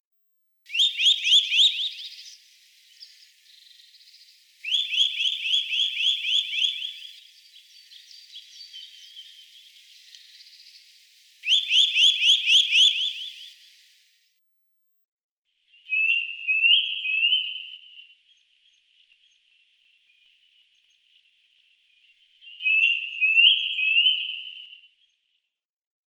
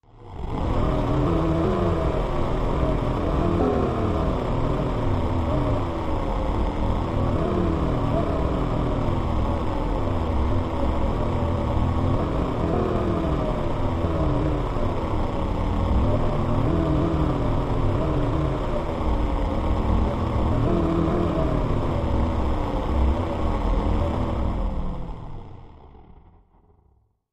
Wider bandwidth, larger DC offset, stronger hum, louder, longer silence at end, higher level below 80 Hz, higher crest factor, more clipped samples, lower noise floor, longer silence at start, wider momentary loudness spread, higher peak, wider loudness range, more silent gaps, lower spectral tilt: first, 19 kHz vs 9.8 kHz; neither; neither; first, -19 LUFS vs -25 LUFS; first, 1.4 s vs 1.2 s; second, under -90 dBFS vs -28 dBFS; first, 22 dB vs 14 dB; neither; first, -83 dBFS vs -62 dBFS; first, 0.7 s vs 0.15 s; first, 26 LU vs 4 LU; about the same, -6 dBFS vs -8 dBFS; first, 11 LU vs 2 LU; first, 15.08-15.43 s vs none; second, 11.5 dB/octave vs -8.5 dB/octave